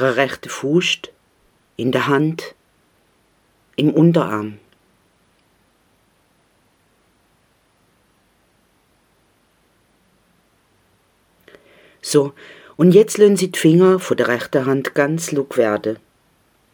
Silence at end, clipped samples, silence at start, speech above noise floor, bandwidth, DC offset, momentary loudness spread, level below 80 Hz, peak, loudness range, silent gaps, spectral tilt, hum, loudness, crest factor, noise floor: 0.8 s; under 0.1%; 0 s; 44 dB; over 20 kHz; under 0.1%; 18 LU; -66 dBFS; 0 dBFS; 11 LU; none; -5.5 dB/octave; none; -17 LUFS; 20 dB; -60 dBFS